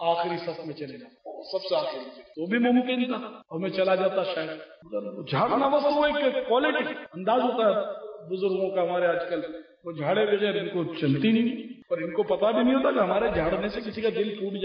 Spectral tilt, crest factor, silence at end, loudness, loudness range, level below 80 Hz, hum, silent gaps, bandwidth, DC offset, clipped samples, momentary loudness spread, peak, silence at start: -8.5 dB/octave; 14 dB; 0 s; -26 LUFS; 3 LU; -56 dBFS; none; none; 5.4 kHz; under 0.1%; under 0.1%; 14 LU; -12 dBFS; 0 s